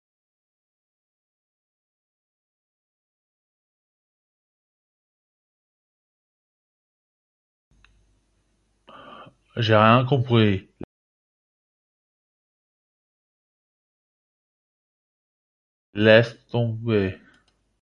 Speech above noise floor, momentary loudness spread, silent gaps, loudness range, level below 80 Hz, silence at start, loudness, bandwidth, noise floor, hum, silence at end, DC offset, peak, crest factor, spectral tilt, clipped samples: 49 dB; 14 LU; 10.84-15.93 s; 7 LU; -56 dBFS; 9.2 s; -20 LUFS; 6.8 kHz; -68 dBFS; none; 0.65 s; under 0.1%; -2 dBFS; 26 dB; -8 dB/octave; under 0.1%